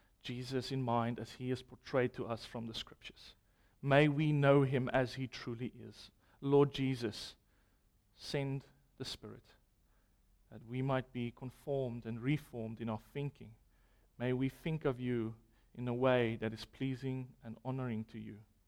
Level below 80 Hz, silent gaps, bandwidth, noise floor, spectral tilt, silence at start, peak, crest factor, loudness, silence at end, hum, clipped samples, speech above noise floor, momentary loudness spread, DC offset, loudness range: -64 dBFS; none; 13.5 kHz; -72 dBFS; -7 dB/octave; 0.25 s; -16 dBFS; 22 dB; -37 LUFS; 0.25 s; none; under 0.1%; 36 dB; 17 LU; under 0.1%; 9 LU